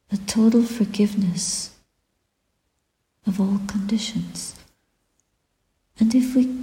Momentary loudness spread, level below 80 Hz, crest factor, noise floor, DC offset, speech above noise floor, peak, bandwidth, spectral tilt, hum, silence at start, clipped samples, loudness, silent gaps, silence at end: 13 LU; -56 dBFS; 16 dB; -74 dBFS; under 0.1%; 53 dB; -8 dBFS; 16.5 kHz; -5 dB/octave; none; 0.1 s; under 0.1%; -22 LUFS; none; 0 s